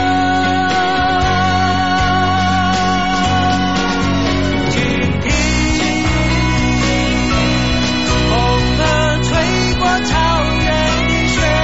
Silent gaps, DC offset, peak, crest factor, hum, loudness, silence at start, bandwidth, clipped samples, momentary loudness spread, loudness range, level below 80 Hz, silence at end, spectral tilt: none; 3%; -2 dBFS; 12 dB; none; -14 LUFS; 0 s; 8 kHz; under 0.1%; 2 LU; 1 LU; -24 dBFS; 0 s; -4.5 dB/octave